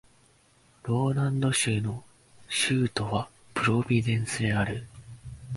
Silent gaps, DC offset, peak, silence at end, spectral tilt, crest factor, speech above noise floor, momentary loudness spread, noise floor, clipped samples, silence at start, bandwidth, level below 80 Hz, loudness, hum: none; under 0.1%; -12 dBFS; 0 s; -5 dB/octave; 18 dB; 35 dB; 17 LU; -61 dBFS; under 0.1%; 0.85 s; 11.5 kHz; -52 dBFS; -27 LUFS; none